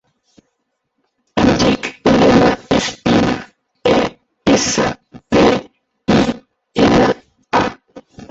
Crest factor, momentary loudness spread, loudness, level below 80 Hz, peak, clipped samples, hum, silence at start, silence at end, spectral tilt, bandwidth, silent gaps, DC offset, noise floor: 14 dB; 12 LU; -15 LUFS; -38 dBFS; 0 dBFS; under 0.1%; none; 1.35 s; 0.05 s; -5 dB/octave; 8 kHz; none; under 0.1%; -71 dBFS